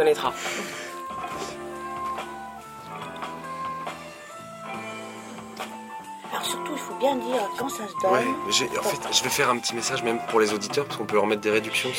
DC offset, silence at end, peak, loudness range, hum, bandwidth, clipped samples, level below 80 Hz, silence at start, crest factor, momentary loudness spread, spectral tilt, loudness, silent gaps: under 0.1%; 0 s; -4 dBFS; 12 LU; none; 16.5 kHz; under 0.1%; -62 dBFS; 0 s; 24 dB; 16 LU; -2.5 dB/octave; -27 LUFS; none